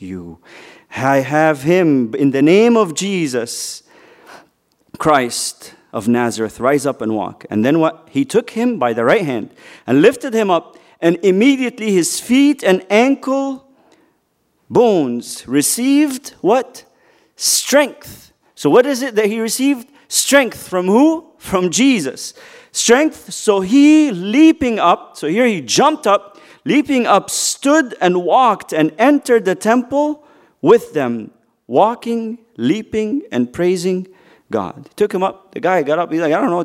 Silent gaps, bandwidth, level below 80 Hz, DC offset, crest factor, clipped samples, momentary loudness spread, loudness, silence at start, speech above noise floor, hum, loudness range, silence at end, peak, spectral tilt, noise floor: none; 16 kHz; -56 dBFS; under 0.1%; 16 dB; under 0.1%; 11 LU; -15 LUFS; 0 s; 49 dB; none; 5 LU; 0 s; 0 dBFS; -4 dB/octave; -63 dBFS